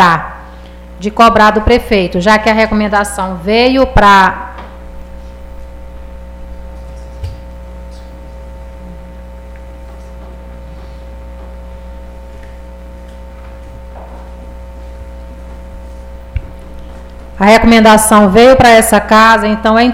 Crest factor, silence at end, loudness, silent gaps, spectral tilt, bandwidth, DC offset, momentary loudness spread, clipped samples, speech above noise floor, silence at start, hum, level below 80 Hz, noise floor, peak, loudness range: 12 dB; 0 s; -7 LUFS; none; -4.5 dB/octave; 16.5 kHz; under 0.1%; 27 LU; under 0.1%; 22 dB; 0 s; 60 Hz at -30 dBFS; -26 dBFS; -29 dBFS; 0 dBFS; 24 LU